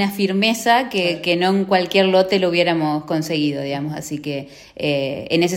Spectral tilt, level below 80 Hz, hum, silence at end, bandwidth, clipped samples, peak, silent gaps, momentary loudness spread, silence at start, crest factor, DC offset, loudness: -5 dB/octave; -58 dBFS; none; 0 s; 16.5 kHz; under 0.1%; -2 dBFS; none; 11 LU; 0 s; 16 dB; under 0.1%; -19 LUFS